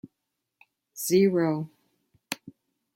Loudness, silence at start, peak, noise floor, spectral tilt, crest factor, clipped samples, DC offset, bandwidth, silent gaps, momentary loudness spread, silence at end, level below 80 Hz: -26 LUFS; 0.95 s; -10 dBFS; -83 dBFS; -5.5 dB/octave; 18 dB; under 0.1%; under 0.1%; 16.5 kHz; none; 18 LU; 0.45 s; -72 dBFS